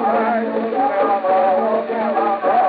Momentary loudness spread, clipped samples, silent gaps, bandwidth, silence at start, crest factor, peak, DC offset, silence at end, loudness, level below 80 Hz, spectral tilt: 4 LU; under 0.1%; none; 4.9 kHz; 0 s; 12 dB; -6 dBFS; under 0.1%; 0 s; -18 LUFS; -72 dBFS; -3.5 dB/octave